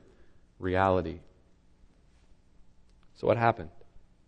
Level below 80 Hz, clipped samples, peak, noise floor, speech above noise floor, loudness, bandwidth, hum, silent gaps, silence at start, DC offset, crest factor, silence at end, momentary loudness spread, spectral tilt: -56 dBFS; under 0.1%; -10 dBFS; -61 dBFS; 33 dB; -29 LUFS; 8.6 kHz; none; none; 0.6 s; under 0.1%; 24 dB; 0.3 s; 17 LU; -8.5 dB/octave